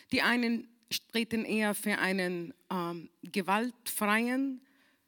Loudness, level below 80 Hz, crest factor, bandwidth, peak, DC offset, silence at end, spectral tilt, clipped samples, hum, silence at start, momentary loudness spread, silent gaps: -32 LUFS; -74 dBFS; 20 dB; 19 kHz; -12 dBFS; under 0.1%; 0.5 s; -4 dB/octave; under 0.1%; none; 0.1 s; 10 LU; none